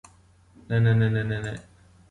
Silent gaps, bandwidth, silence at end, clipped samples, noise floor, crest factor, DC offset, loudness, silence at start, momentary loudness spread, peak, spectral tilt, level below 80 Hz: none; 9.2 kHz; 0.5 s; under 0.1%; -56 dBFS; 16 dB; under 0.1%; -25 LUFS; 0.7 s; 14 LU; -10 dBFS; -8 dB/octave; -52 dBFS